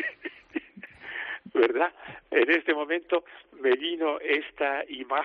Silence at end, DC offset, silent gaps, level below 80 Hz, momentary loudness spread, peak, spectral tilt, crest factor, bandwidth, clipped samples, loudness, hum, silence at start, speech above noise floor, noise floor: 0 s; under 0.1%; none; -70 dBFS; 15 LU; -8 dBFS; 0 dB/octave; 20 dB; 5.4 kHz; under 0.1%; -27 LUFS; none; 0 s; 20 dB; -47 dBFS